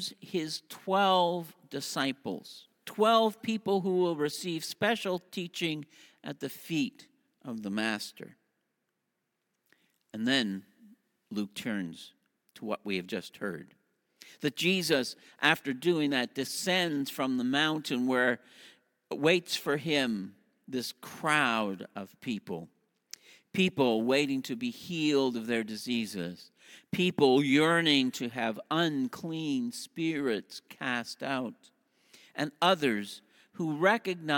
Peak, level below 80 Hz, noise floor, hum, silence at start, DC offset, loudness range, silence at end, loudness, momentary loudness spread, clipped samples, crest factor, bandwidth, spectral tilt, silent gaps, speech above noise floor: -8 dBFS; -76 dBFS; -82 dBFS; none; 0 s; under 0.1%; 9 LU; 0 s; -30 LUFS; 16 LU; under 0.1%; 24 dB; 17.5 kHz; -4.5 dB/octave; none; 52 dB